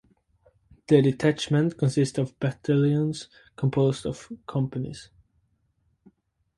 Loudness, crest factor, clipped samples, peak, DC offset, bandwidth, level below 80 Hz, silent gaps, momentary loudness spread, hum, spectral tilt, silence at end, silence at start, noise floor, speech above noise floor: -25 LUFS; 20 dB; under 0.1%; -6 dBFS; under 0.1%; 11.5 kHz; -58 dBFS; none; 15 LU; none; -7 dB/octave; 1.55 s; 0.9 s; -70 dBFS; 46 dB